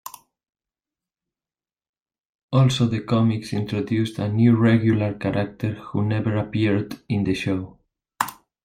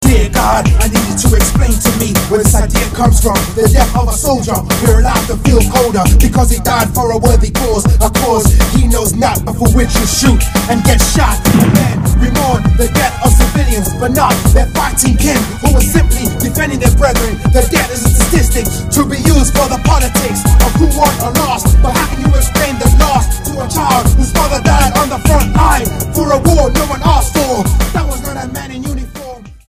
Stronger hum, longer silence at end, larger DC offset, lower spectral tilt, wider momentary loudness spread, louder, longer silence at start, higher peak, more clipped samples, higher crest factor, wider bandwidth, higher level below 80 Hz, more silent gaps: neither; first, 0.3 s vs 0.15 s; neither; first, -7 dB/octave vs -5 dB/octave; first, 11 LU vs 4 LU; second, -22 LUFS vs -11 LUFS; about the same, 0.05 s vs 0 s; second, -4 dBFS vs 0 dBFS; second, under 0.1% vs 0.2%; first, 20 dB vs 10 dB; about the same, 16 kHz vs 16 kHz; second, -56 dBFS vs -14 dBFS; first, 1.89-1.93 s, 2.25-2.49 s vs none